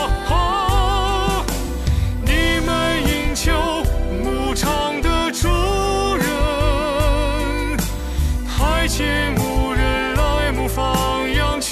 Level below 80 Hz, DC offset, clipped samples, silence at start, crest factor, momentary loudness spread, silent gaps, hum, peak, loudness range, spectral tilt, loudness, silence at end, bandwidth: -22 dBFS; under 0.1%; under 0.1%; 0 s; 12 dB; 4 LU; none; none; -6 dBFS; 1 LU; -4.5 dB/octave; -19 LUFS; 0 s; 14 kHz